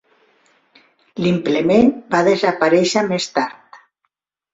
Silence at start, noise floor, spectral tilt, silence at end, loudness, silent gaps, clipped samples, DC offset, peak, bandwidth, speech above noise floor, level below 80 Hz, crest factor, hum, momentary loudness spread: 1.15 s; -73 dBFS; -5 dB/octave; 0.75 s; -17 LUFS; none; under 0.1%; under 0.1%; -2 dBFS; 8 kHz; 58 dB; -56 dBFS; 18 dB; none; 8 LU